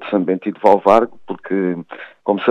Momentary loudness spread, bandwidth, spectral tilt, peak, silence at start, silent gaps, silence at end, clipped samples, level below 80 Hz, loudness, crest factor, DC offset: 15 LU; 9.4 kHz; -7.5 dB/octave; 0 dBFS; 0 s; none; 0 s; under 0.1%; -60 dBFS; -17 LUFS; 16 dB; under 0.1%